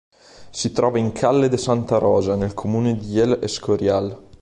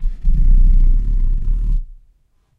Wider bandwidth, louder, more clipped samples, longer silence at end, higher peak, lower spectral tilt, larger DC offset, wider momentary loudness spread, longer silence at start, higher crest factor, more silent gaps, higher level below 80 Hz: first, 11 kHz vs 0.5 kHz; about the same, -20 LUFS vs -20 LUFS; neither; second, 0.2 s vs 0.65 s; about the same, -4 dBFS vs -4 dBFS; second, -6 dB/octave vs -9.5 dB/octave; neither; second, 6 LU vs 9 LU; first, 0.4 s vs 0 s; first, 16 dB vs 10 dB; neither; second, -46 dBFS vs -14 dBFS